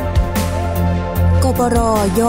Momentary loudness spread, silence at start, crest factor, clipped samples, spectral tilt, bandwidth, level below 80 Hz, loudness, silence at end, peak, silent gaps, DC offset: 4 LU; 0 s; 12 dB; under 0.1%; -6.5 dB/octave; 16.5 kHz; -22 dBFS; -16 LUFS; 0 s; -2 dBFS; none; under 0.1%